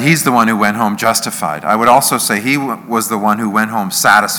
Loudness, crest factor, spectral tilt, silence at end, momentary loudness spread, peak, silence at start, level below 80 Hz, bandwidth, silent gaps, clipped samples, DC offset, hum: -13 LUFS; 14 dB; -3.5 dB/octave; 0 s; 7 LU; 0 dBFS; 0 s; -56 dBFS; over 20 kHz; none; 0.5%; under 0.1%; none